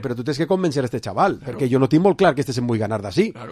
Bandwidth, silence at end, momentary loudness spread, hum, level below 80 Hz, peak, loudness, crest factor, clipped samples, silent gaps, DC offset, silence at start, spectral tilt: 14 kHz; 0 s; 8 LU; none; -50 dBFS; -2 dBFS; -20 LUFS; 18 dB; under 0.1%; none; under 0.1%; 0 s; -7 dB/octave